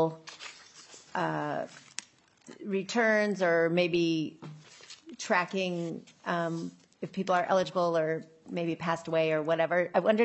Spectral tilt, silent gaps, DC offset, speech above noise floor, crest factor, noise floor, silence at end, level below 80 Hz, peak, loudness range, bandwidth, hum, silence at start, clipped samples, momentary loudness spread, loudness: -5.5 dB/octave; none; under 0.1%; 28 dB; 18 dB; -57 dBFS; 0 s; -78 dBFS; -12 dBFS; 4 LU; 9 kHz; none; 0 s; under 0.1%; 19 LU; -30 LUFS